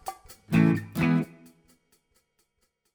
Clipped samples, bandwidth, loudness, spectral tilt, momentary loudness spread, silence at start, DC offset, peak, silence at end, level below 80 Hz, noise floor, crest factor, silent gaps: under 0.1%; over 20 kHz; -25 LUFS; -7.5 dB/octave; 15 LU; 0.05 s; under 0.1%; -8 dBFS; 1.7 s; -56 dBFS; -75 dBFS; 20 dB; none